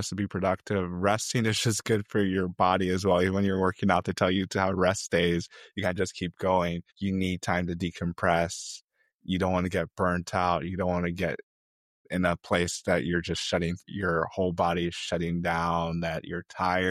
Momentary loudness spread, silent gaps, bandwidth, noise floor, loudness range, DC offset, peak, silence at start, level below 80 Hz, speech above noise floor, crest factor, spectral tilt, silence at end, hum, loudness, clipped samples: 7 LU; 8.84-8.88 s, 9.14-9.19 s, 11.43-12.05 s; 14 kHz; under -90 dBFS; 4 LU; under 0.1%; -6 dBFS; 0 s; -54 dBFS; over 62 dB; 20 dB; -5 dB/octave; 0 s; none; -28 LUFS; under 0.1%